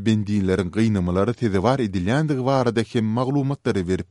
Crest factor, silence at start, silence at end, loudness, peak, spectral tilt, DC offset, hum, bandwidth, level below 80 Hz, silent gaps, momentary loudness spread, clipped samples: 18 dB; 0 s; 0.05 s; -22 LUFS; -4 dBFS; -7.5 dB/octave; under 0.1%; none; 11.5 kHz; -48 dBFS; none; 3 LU; under 0.1%